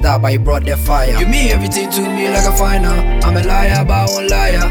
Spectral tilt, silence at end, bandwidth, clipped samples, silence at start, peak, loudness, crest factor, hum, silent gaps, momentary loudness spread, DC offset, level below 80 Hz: -5 dB/octave; 0 s; 17.5 kHz; under 0.1%; 0 s; 0 dBFS; -14 LUFS; 10 dB; none; none; 3 LU; under 0.1%; -14 dBFS